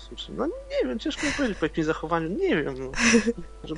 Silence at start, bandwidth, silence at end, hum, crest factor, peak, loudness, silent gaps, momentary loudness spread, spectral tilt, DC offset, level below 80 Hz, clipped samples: 0 s; 10.5 kHz; 0 s; none; 20 dB; -6 dBFS; -26 LUFS; none; 10 LU; -4 dB/octave; under 0.1%; -44 dBFS; under 0.1%